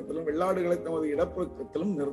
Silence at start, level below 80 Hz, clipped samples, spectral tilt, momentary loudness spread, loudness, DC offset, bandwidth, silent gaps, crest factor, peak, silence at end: 0 s; -56 dBFS; under 0.1%; -7.5 dB/octave; 6 LU; -30 LUFS; under 0.1%; 12.5 kHz; none; 14 dB; -14 dBFS; 0 s